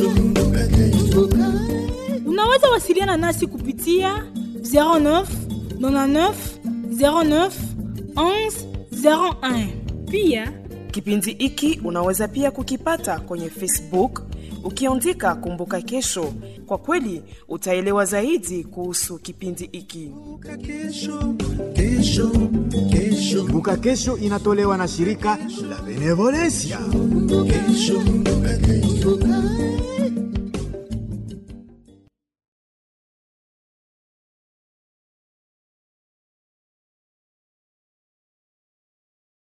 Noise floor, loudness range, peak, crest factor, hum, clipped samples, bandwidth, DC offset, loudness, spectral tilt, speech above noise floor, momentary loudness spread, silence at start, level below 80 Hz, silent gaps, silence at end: -54 dBFS; 6 LU; -2 dBFS; 20 dB; none; under 0.1%; 14 kHz; under 0.1%; -20 LUFS; -5 dB/octave; 33 dB; 13 LU; 0 s; -32 dBFS; none; 7.95 s